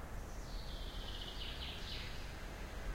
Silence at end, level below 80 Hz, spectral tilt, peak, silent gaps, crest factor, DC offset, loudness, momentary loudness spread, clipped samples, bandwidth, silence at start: 0 s; -48 dBFS; -4 dB/octave; -32 dBFS; none; 12 dB; under 0.1%; -47 LUFS; 4 LU; under 0.1%; 16 kHz; 0 s